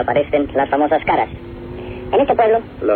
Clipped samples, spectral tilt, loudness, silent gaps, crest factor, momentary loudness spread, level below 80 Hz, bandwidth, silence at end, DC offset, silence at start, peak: under 0.1%; -9.5 dB/octave; -17 LUFS; none; 14 dB; 16 LU; -40 dBFS; 4.5 kHz; 0 s; under 0.1%; 0 s; -2 dBFS